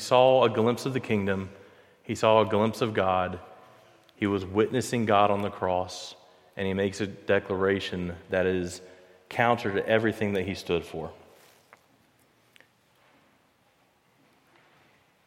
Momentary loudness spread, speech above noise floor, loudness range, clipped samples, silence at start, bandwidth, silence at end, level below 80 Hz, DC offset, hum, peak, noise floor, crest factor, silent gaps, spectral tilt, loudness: 15 LU; 40 dB; 5 LU; under 0.1%; 0 s; 16 kHz; 4.1 s; -62 dBFS; under 0.1%; none; -8 dBFS; -66 dBFS; 20 dB; none; -5.5 dB/octave; -26 LUFS